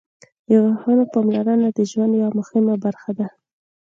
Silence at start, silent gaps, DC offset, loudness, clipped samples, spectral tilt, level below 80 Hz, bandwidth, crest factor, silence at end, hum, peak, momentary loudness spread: 0.5 s; none; under 0.1%; -19 LUFS; under 0.1%; -8 dB/octave; -68 dBFS; 7.4 kHz; 14 dB; 0.6 s; none; -4 dBFS; 10 LU